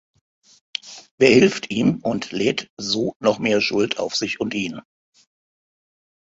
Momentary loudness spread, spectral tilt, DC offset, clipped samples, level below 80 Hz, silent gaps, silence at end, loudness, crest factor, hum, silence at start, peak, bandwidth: 16 LU; -4.5 dB/octave; under 0.1%; under 0.1%; -58 dBFS; 1.11-1.18 s, 2.70-2.77 s, 3.16-3.20 s; 1.5 s; -20 LUFS; 22 dB; none; 0.85 s; 0 dBFS; 8 kHz